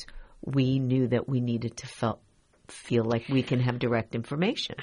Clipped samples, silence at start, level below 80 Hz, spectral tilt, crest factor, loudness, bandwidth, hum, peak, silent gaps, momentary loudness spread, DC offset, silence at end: under 0.1%; 0 s; -54 dBFS; -7 dB/octave; 16 dB; -28 LUFS; 10.5 kHz; none; -12 dBFS; none; 15 LU; under 0.1%; 0 s